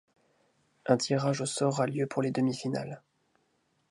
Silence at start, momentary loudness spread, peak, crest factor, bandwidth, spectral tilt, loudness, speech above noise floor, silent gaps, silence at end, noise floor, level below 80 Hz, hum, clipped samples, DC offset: 0.85 s; 12 LU; -10 dBFS; 22 dB; 11.5 kHz; -5.5 dB/octave; -30 LUFS; 44 dB; none; 0.95 s; -74 dBFS; -74 dBFS; none; under 0.1%; under 0.1%